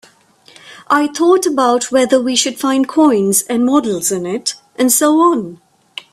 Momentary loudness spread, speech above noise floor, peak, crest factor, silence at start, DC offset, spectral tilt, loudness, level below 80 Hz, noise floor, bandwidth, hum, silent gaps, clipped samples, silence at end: 9 LU; 34 dB; 0 dBFS; 14 dB; 0.65 s; under 0.1%; -3 dB/octave; -13 LUFS; -60 dBFS; -48 dBFS; 16 kHz; none; none; under 0.1%; 0.55 s